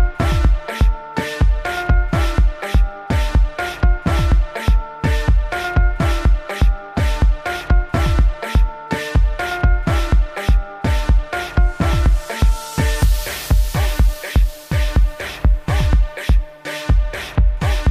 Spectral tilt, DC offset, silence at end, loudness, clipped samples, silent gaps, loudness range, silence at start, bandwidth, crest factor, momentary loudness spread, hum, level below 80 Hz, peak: -6 dB/octave; under 0.1%; 0 s; -19 LUFS; under 0.1%; none; 1 LU; 0 s; 15.5 kHz; 10 dB; 4 LU; none; -16 dBFS; -4 dBFS